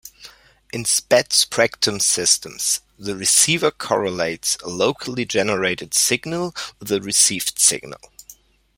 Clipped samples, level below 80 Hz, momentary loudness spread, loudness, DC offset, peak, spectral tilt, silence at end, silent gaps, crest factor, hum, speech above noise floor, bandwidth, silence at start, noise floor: under 0.1%; -56 dBFS; 11 LU; -18 LUFS; under 0.1%; 0 dBFS; -1.5 dB/octave; 0.45 s; none; 20 dB; none; 28 dB; 16.5 kHz; 0.05 s; -48 dBFS